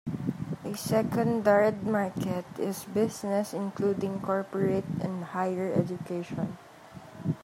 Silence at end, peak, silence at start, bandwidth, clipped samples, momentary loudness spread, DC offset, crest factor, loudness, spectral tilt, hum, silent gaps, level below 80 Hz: 0 s; -10 dBFS; 0.05 s; 16 kHz; under 0.1%; 10 LU; under 0.1%; 20 dB; -30 LUFS; -6.5 dB/octave; none; none; -64 dBFS